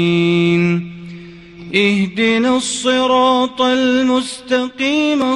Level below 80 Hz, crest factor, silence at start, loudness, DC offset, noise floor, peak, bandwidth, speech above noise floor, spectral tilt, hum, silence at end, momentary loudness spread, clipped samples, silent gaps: -52 dBFS; 16 dB; 0 s; -15 LUFS; under 0.1%; -35 dBFS; 0 dBFS; 11.5 kHz; 21 dB; -5 dB/octave; none; 0 s; 7 LU; under 0.1%; none